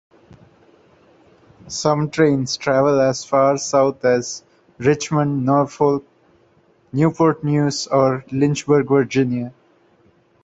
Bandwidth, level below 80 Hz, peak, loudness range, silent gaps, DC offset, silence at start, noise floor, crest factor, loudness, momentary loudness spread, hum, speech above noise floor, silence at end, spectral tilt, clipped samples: 8.2 kHz; -56 dBFS; -2 dBFS; 2 LU; none; under 0.1%; 1.65 s; -56 dBFS; 18 dB; -18 LUFS; 6 LU; none; 39 dB; 0.95 s; -6 dB/octave; under 0.1%